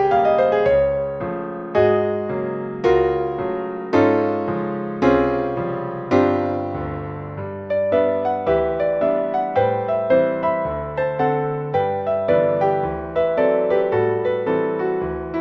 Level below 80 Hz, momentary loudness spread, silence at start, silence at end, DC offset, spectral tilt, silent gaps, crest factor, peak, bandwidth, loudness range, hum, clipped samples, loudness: -44 dBFS; 8 LU; 0 s; 0 s; under 0.1%; -8.5 dB/octave; none; 16 dB; -2 dBFS; 6.6 kHz; 2 LU; none; under 0.1%; -20 LUFS